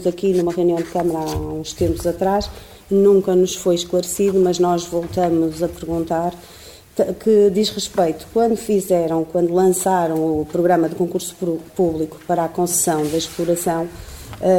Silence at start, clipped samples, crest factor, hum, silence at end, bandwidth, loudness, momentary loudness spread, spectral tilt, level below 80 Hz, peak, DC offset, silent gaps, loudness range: 0 s; under 0.1%; 14 dB; none; 0 s; 17 kHz; -19 LUFS; 9 LU; -5 dB/octave; -42 dBFS; -4 dBFS; 0.1%; none; 3 LU